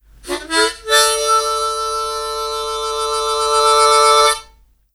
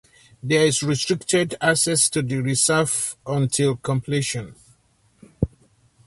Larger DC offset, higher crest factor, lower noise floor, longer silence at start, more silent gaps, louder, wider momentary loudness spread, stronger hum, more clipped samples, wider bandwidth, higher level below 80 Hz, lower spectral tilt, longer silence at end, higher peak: neither; about the same, 16 dB vs 18 dB; second, -50 dBFS vs -61 dBFS; second, 0.25 s vs 0.45 s; neither; first, -15 LUFS vs -21 LUFS; about the same, 11 LU vs 11 LU; neither; neither; first, 15.5 kHz vs 12 kHz; about the same, -44 dBFS vs -46 dBFS; second, 0.5 dB/octave vs -3.5 dB/octave; about the same, 0.5 s vs 0.6 s; first, 0 dBFS vs -4 dBFS